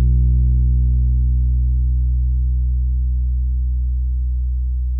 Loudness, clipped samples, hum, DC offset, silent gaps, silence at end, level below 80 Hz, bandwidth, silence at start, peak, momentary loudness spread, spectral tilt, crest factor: -19 LUFS; under 0.1%; none; under 0.1%; none; 0 s; -16 dBFS; 0.5 kHz; 0 s; -8 dBFS; 5 LU; -14 dB/octave; 8 dB